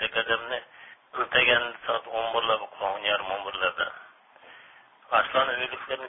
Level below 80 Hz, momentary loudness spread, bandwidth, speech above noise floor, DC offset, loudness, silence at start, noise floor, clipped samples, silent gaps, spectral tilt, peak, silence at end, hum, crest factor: -62 dBFS; 11 LU; 3.9 kHz; 26 dB; under 0.1%; -26 LUFS; 0 s; -54 dBFS; under 0.1%; none; -6.5 dB/octave; -6 dBFS; 0 s; none; 22 dB